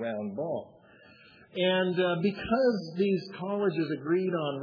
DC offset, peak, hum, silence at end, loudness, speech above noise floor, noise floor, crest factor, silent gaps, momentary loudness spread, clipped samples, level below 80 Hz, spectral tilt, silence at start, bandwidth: under 0.1%; -14 dBFS; none; 0 s; -29 LUFS; 27 dB; -56 dBFS; 16 dB; none; 8 LU; under 0.1%; -64 dBFS; -8 dB/octave; 0 s; 5.4 kHz